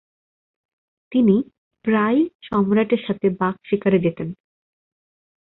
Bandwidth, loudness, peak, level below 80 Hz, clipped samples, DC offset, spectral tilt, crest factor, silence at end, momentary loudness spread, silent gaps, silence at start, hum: 4.1 kHz; -20 LUFS; -6 dBFS; -58 dBFS; under 0.1%; under 0.1%; -11 dB/octave; 16 dB; 1.1 s; 9 LU; 1.58-1.71 s, 2.35-2.39 s; 1.1 s; none